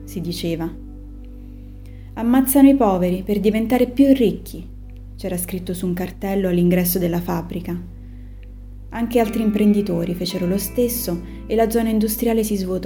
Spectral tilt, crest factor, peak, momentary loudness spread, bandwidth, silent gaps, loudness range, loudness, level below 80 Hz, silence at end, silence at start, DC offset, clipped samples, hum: -6 dB/octave; 18 dB; -2 dBFS; 24 LU; over 20 kHz; none; 5 LU; -19 LUFS; -36 dBFS; 0 s; 0 s; under 0.1%; under 0.1%; none